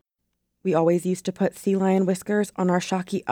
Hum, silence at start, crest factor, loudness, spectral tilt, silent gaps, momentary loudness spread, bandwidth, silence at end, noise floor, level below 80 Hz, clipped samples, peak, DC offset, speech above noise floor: none; 0.65 s; 16 dB; -24 LUFS; -6.5 dB/octave; none; 6 LU; 16 kHz; 0 s; -78 dBFS; -66 dBFS; under 0.1%; -8 dBFS; under 0.1%; 55 dB